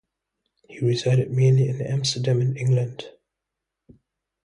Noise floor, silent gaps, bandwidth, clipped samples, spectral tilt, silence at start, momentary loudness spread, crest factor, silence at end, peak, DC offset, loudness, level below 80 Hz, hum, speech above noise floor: -84 dBFS; none; 10.5 kHz; under 0.1%; -6 dB/octave; 0.7 s; 10 LU; 14 dB; 1.35 s; -8 dBFS; under 0.1%; -22 LUFS; -60 dBFS; 50 Hz at -60 dBFS; 63 dB